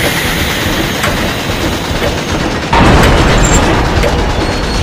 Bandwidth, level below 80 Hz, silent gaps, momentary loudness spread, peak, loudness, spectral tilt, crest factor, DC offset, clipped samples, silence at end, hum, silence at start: 16.5 kHz; -18 dBFS; none; 7 LU; 0 dBFS; -11 LUFS; -4.5 dB/octave; 10 dB; under 0.1%; 0.8%; 0 s; none; 0 s